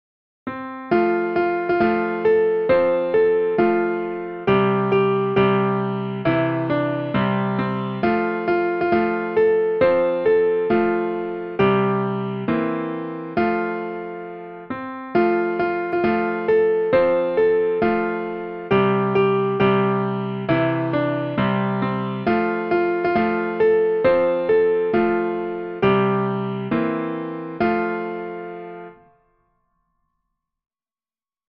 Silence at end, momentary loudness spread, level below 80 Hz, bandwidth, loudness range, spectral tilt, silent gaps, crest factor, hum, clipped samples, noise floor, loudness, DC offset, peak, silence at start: 2.6 s; 10 LU; -54 dBFS; 5.4 kHz; 5 LU; -10 dB/octave; none; 16 dB; none; under 0.1%; under -90 dBFS; -20 LUFS; under 0.1%; -6 dBFS; 0.45 s